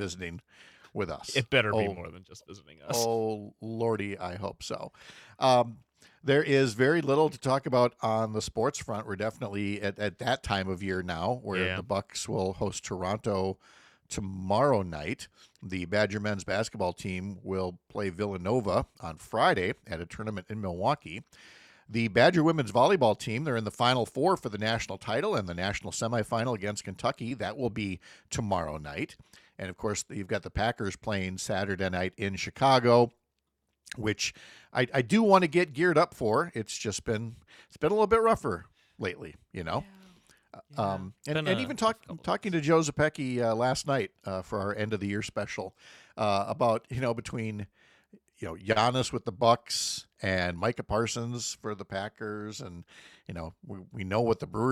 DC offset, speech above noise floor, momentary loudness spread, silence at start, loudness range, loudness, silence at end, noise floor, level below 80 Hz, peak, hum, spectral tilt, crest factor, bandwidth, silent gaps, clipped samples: under 0.1%; 51 dB; 15 LU; 0 s; 7 LU; -29 LUFS; 0 s; -80 dBFS; -58 dBFS; -8 dBFS; none; -5 dB/octave; 22 dB; 15.5 kHz; none; under 0.1%